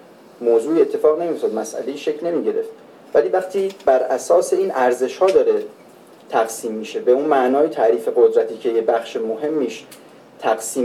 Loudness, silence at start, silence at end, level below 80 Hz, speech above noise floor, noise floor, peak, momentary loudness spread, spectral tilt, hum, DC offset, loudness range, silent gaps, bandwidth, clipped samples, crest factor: -19 LUFS; 0.4 s; 0 s; -68 dBFS; 27 dB; -45 dBFS; -2 dBFS; 9 LU; -4 dB/octave; none; under 0.1%; 2 LU; none; 14.5 kHz; under 0.1%; 16 dB